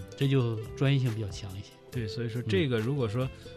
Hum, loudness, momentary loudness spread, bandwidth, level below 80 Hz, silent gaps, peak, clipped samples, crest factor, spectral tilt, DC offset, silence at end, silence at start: none; -30 LUFS; 12 LU; 13.5 kHz; -54 dBFS; none; -16 dBFS; under 0.1%; 14 dB; -7 dB/octave; under 0.1%; 0 s; 0 s